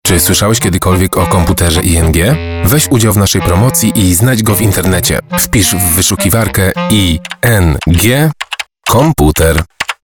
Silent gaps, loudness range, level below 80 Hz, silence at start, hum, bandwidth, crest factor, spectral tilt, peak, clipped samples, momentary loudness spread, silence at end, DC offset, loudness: none; 1 LU; -26 dBFS; 0.05 s; none; over 20 kHz; 10 dB; -4.5 dB/octave; 0 dBFS; under 0.1%; 4 LU; 0.1 s; 1%; -10 LUFS